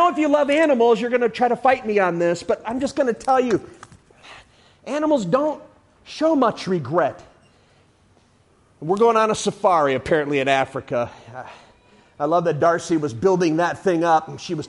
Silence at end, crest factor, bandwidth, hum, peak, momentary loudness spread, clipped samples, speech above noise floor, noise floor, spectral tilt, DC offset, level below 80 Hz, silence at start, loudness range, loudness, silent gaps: 0 s; 16 dB; 11.5 kHz; none; -4 dBFS; 10 LU; under 0.1%; 38 dB; -57 dBFS; -5.5 dB/octave; under 0.1%; -56 dBFS; 0 s; 4 LU; -20 LUFS; none